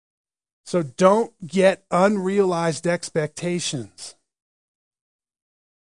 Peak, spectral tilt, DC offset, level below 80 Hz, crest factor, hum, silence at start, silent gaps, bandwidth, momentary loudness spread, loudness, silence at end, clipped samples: -2 dBFS; -5 dB/octave; 0.1%; -68 dBFS; 22 dB; none; 0.65 s; none; 10.5 kHz; 12 LU; -21 LUFS; 1.75 s; under 0.1%